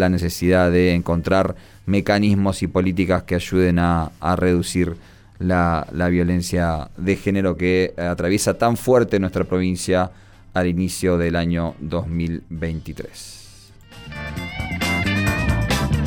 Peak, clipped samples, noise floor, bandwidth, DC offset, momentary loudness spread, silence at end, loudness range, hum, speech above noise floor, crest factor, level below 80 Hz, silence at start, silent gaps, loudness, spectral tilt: -6 dBFS; under 0.1%; -44 dBFS; 20 kHz; under 0.1%; 10 LU; 0 s; 6 LU; none; 25 dB; 14 dB; -36 dBFS; 0 s; none; -20 LUFS; -6 dB/octave